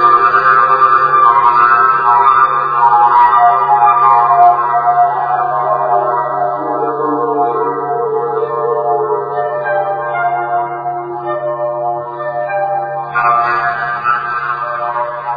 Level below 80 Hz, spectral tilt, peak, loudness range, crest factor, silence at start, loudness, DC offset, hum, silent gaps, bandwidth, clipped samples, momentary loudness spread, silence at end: -54 dBFS; -7.5 dB/octave; 0 dBFS; 8 LU; 12 dB; 0 s; -12 LUFS; under 0.1%; none; none; 5 kHz; under 0.1%; 10 LU; 0 s